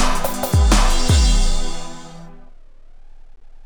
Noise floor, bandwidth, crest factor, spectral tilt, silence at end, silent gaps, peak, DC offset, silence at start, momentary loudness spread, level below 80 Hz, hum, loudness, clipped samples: -39 dBFS; over 20 kHz; 14 dB; -4 dB/octave; 0.2 s; none; -2 dBFS; under 0.1%; 0 s; 20 LU; -18 dBFS; none; -18 LUFS; under 0.1%